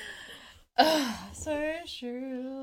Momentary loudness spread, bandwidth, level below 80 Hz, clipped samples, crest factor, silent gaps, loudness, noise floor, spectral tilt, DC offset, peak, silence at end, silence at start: 19 LU; 17 kHz; -58 dBFS; under 0.1%; 24 dB; none; -30 LUFS; -51 dBFS; -3 dB/octave; under 0.1%; -8 dBFS; 0 s; 0 s